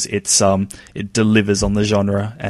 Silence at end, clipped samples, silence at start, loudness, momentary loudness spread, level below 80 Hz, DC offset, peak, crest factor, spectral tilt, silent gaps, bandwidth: 0 s; under 0.1%; 0 s; -16 LUFS; 9 LU; -36 dBFS; under 0.1%; -2 dBFS; 16 dB; -4 dB/octave; none; 13 kHz